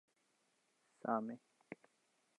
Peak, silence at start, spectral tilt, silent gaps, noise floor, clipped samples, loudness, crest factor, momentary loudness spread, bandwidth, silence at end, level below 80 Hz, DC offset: -22 dBFS; 1.05 s; -8 dB/octave; none; -80 dBFS; under 0.1%; -43 LUFS; 26 dB; 17 LU; 11 kHz; 0.65 s; under -90 dBFS; under 0.1%